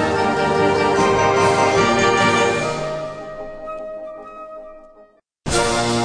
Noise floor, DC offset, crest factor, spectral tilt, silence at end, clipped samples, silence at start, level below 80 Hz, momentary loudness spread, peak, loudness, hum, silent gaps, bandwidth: -51 dBFS; under 0.1%; 16 dB; -4 dB/octave; 0 s; under 0.1%; 0 s; -42 dBFS; 19 LU; -2 dBFS; -17 LUFS; none; none; 10.5 kHz